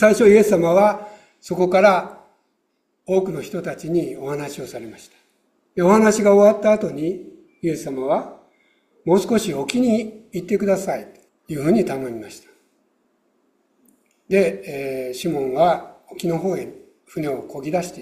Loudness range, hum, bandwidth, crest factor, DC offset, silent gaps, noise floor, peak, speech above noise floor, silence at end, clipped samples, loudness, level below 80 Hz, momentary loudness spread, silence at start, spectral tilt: 9 LU; none; 15.5 kHz; 18 dB; under 0.1%; none; -70 dBFS; -2 dBFS; 52 dB; 0 s; under 0.1%; -19 LUFS; -58 dBFS; 18 LU; 0 s; -6 dB/octave